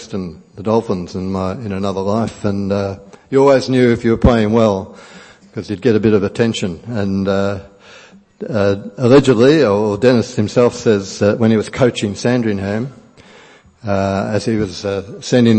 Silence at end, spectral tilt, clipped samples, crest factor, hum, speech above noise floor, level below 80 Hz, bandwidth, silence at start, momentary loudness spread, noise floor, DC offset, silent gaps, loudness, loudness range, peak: 0 s; -6.5 dB/octave; under 0.1%; 14 dB; none; 30 dB; -36 dBFS; 8.8 kHz; 0 s; 12 LU; -44 dBFS; under 0.1%; none; -15 LUFS; 6 LU; 0 dBFS